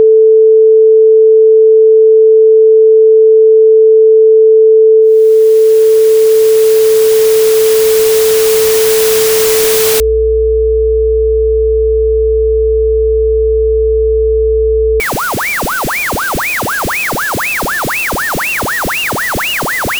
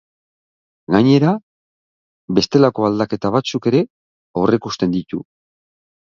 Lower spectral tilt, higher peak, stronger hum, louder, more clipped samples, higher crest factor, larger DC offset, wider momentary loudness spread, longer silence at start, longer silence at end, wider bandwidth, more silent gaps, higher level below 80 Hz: second, -3.5 dB/octave vs -7 dB/octave; about the same, -2 dBFS vs 0 dBFS; neither; first, -8 LUFS vs -17 LUFS; neither; second, 6 dB vs 18 dB; neither; second, 7 LU vs 12 LU; second, 0 s vs 0.9 s; second, 0 s vs 0.9 s; first, over 20 kHz vs 7.4 kHz; second, none vs 1.43-2.28 s, 3.90-4.34 s; first, -24 dBFS vs -52 dBFS